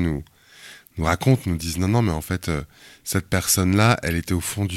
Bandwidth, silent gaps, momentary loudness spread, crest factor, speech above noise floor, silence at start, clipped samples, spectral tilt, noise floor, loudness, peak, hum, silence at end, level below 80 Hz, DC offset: 16.5 kHz; none; 17 LU; 20 dB; 24 dB; 0 s; under 0.1%; -5 dB/octave; -46 dBFS; -22 LUFS; -2 dBFS; none; 0 s; -38 dBFS; under 0.1%